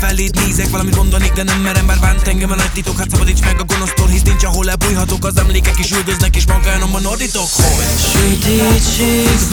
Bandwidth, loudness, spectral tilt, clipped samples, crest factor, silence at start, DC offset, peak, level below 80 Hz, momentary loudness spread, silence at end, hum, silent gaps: over 20 kHz; -13 LUFS; -4 dB/octave; under 0.1%; 12 dB; 0 s; under 0.1%; 0 dBFS; -14 dBFS; 4 LU; 0 s; none; none